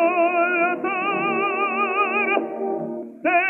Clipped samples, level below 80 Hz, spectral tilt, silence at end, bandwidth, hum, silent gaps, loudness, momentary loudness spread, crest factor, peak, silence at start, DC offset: under 0.1%; -82 dBFS; -7 dB/octave; 0 s; 3.4 kHz; none; none; -21 LUFS; 8 LU; 16 dB; -6 dBFS; 0 s; under 0.1%